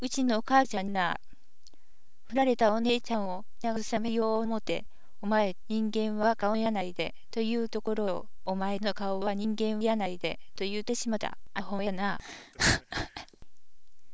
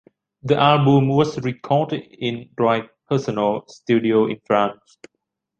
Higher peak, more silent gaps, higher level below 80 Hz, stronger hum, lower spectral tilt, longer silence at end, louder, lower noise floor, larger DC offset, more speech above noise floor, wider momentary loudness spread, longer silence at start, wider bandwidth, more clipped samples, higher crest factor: second, -10 dBFS vs -2 dBFS; neither; first, -54 dBFS vs -60 dBFS; neither; second, -4.5 dB/octave vs -7.5 dB/octave; second, 0 s vs 0.85 s; second, -31 LUFS vs -20 LUFS; second, -65 dBFS vs -78 dBFS; first, 2% vs under 0.1%; second, 35 dB vs 59 dB; about the same, 11 LU vs 11 LU; second, 0 s vs 0.45 s; about the same, 8 kHz vs 7.6 kHz; neither; about the same, 20 dB vs 18 dB